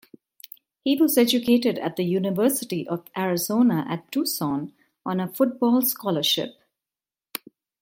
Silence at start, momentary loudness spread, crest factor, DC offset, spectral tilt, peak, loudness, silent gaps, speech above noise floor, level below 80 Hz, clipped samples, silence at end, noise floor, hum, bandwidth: 0.85 s; 17 LU; 18 dB; under 0.1%; -4.5 dB/octave; -6 dBFS; -23 LUFS; none; over 67 dB; -70 dBFS; under 0.1%; 0.45 s; under -90 dBFS; none; 17 kHz